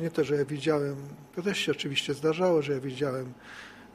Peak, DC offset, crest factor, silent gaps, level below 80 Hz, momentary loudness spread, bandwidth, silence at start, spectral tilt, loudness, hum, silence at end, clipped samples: -12 dBFS; under 0.1%; 16 dB; none; -68 dBFS; 15 LU; 14.5 kHz; 0 s; -5 dB/octave; -29 LUFS; none; 0.05 s; under 0.1%